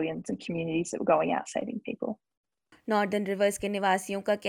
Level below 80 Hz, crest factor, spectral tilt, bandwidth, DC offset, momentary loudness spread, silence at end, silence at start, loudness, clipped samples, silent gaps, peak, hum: -66 dBFS; 18 dB; -5 dB/octave; 17.5 kHz; under 0.1%; 10 LU; 0 s; 0 s; -29 LUFS; under 0.1%; 2.37-2.44 s; -10 dBFS; none